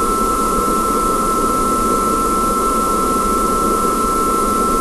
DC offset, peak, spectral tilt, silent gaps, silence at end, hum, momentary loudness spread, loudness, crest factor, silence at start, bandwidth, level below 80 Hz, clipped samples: under 0.1%; -4 dBFS; -4 dB/octave; none; 0 s; none; 0 LU; -15 LUFS; 12 dB; 0 s; 13 kHz; -30 dBFS; under 0.1%